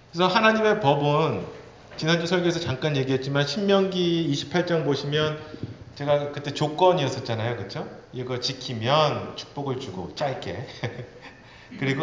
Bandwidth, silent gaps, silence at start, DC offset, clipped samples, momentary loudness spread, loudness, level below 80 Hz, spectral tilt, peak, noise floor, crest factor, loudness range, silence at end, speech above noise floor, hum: 7.6 kHz; none; 0.15 s; under 0.1%; under 0.1%; 16 LU; -24 LUFS; -56 dBFS; -5.5 dB/octave; -6 dBFS; -46 dBFS; 20 dB; 4 LU; 0 s; 22 dB; none